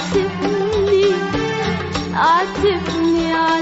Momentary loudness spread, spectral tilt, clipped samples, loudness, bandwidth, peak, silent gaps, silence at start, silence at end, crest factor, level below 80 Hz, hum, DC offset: 6 LU; -4 dB/octave; under 0.1%; -17 LUFS; 8 kHz; -4 dBFS; none; 0 s; 0 s; 12 dB; -40 dBFS; none; under 0.1%